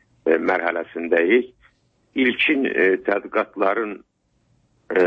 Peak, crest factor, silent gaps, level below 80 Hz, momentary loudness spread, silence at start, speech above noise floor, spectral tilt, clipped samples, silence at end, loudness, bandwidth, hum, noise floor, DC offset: -6 dBFS; 16 dB; none; -64 dBFS; 11 LU; 0.25 s; 45 dB; -6.5 dB/octave; under 0.1%; 0 s; -20 LUFS; 5.6 kHz; none; -65 dBFS; under 0.1%